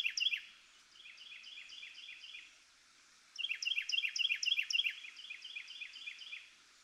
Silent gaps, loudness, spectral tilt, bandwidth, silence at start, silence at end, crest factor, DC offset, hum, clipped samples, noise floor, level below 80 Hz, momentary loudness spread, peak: none; -37 LUFS; 5 dB/octave; 15.5 kHz; 0 s; 0.05 s; 20 dB; under 0.1%; none; under 0.1%; -66 dBFS; -88 dBFS; 20 LU; -22 dBFS